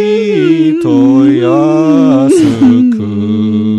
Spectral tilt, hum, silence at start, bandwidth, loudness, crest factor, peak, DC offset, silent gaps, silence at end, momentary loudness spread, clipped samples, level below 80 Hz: -7.5 dB/octave; none; 0 s; 11.5 kHz; -8 LUFS; 8 dB; 0 dBFS; under 0.1%; none; 0 s; 5 LU; under 0.1%; -50 dBFS